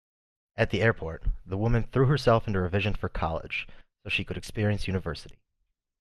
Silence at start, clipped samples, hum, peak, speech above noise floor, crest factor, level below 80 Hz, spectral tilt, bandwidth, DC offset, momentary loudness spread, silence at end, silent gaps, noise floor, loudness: 0.55 s; under 0.1%; none; -8 dBFS; 51 dB; 20 dB; -40 dBFS; -7 dB/octave; 12.5 kHz; under 0.1%; 13 LU; 0.7 s; none; -78 dBFS; -28 LUFS